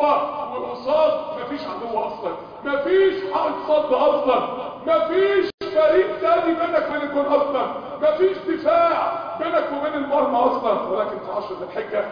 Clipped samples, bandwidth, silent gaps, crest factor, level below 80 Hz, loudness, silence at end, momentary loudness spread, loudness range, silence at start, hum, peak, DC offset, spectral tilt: under 0.1%; 5.2 kHz; 5.54-5.58 s; 16 dB; -58 dBFS; -21 LUFS; 0 s; 10 LU; 3 LU; 0 s; none; -6 dBFS; under 0.1%; -6.5 dB/octave